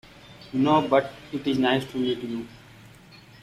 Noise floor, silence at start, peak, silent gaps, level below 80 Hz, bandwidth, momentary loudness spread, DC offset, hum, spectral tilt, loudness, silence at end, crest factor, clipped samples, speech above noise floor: -50 dBFS; 0.25 s; -6 dBFS; none; -60 dBFS; 14 kHz; 14 LU; under 0.1%; none; -6.5 dB/octave; -25 LUFS; 0.85 s; 20 dB; under 0.1%; 26 dB